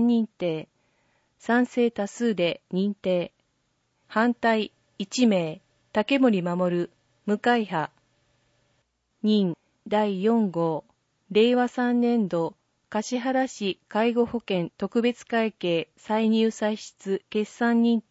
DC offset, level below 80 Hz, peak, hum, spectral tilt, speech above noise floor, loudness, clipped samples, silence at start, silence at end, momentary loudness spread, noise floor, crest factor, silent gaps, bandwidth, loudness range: under 0.1%; -70 dBFS; -8 dBFS; none; -6 dB/octave; 48 dB; -25 LUFS; under 0.1%; 0 s; 0.1 s; 9 LU; -72 dBFS; 16 dB; none; 8 kHz; 3 LU